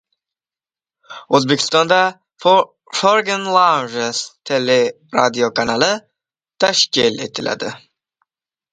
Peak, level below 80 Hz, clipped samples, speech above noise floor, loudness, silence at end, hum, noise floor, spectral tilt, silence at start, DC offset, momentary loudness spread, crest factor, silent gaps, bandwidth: 0 dBFS; -60 dBFS; under 0.1%; over 74 dB; -16 LUFS; 0.95 s; none; under -90 dBFS; -3 dB/octave; 1.1 s; under 0.1%; 9 LU; 18 dB; none; 9.6 kHz